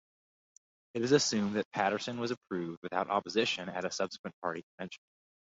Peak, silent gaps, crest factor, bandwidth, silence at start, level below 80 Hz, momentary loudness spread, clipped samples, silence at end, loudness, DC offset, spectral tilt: -12 dBFS; 1.65-1.71 s, 2.37-2.41 s, 2.77-2.82 s, 4.19-4.24 s, 4.33-4.42 s, 4.63-4.78 s; 22 dB; 7.6 kHz; 0.95 s; -74 dBFS; 15 LU; under 0.1%; 0.6 s; -33 LUFS; under 0.1%; -3 dB/octave